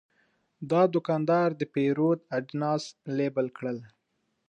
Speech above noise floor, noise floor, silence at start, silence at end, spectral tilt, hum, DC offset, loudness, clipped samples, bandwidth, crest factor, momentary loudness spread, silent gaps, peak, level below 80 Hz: 50 dB; -77 dBFS; 0.6 s; 0.65 s; -7.5 dB/octave; none; under 0.1%; -28 LUFS; under 0.1%; 9.2 kHz; 18 dB; 11 LU; none; -10 dBFS; -78 dBFS